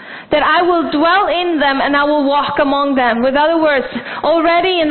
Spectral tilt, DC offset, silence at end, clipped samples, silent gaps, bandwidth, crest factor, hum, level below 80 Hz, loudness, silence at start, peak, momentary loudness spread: -9.5 dB/octave; under 0.1%; 0 s; under 0.1%; none; 4.5 kHz; 14 dB; none; -46 dBFS; -13 LUFS; 0 s; 0 dBFS; 3 LU